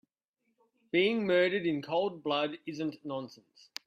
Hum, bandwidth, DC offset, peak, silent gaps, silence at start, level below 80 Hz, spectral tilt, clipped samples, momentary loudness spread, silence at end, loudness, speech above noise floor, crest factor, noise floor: none; 14 kHz; under 0.1%; -14 dBFS; none; 0.95 s; -78 dBFS; -5.5 dB/octave; under 0.1%; 13 LU; 0.55 s; -31 LUFS; 50 dB; 18 dB; -81 dBFS